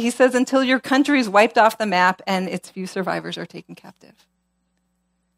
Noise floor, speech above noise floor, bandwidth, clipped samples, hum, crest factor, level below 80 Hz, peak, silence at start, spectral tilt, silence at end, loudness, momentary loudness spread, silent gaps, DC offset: -70 dBFS; 50 dB; 16 kHz; under 0.1%; none; 20 dB; -68 dBFS; -2 dBFS; 0 s; -4.5 dB/octave; 1.45 s; -19 LUFS; 15 LU; none; under 0.1%